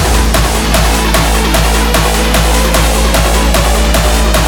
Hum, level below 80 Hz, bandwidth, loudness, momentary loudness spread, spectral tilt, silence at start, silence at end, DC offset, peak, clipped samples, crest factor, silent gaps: none; -12 dBFS; 19 kHz; -10 LUFS; 0 LU; -4 dB/octave; 0 s; 0 s; under 0.1%; 0 dBFS; under 0.1%; 8 dB; none